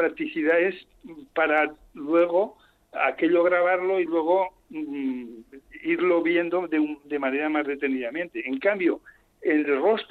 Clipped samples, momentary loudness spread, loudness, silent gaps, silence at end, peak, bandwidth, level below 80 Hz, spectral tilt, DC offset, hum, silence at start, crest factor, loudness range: under 0.1%; 11 LU; -24 LUFS; none; 0.05 s; -8 dBFS; 4.5 kHz; -66 dBFS; -7 dB/octave; under 0.1%; none; 0 s; 16 dB; 3 LU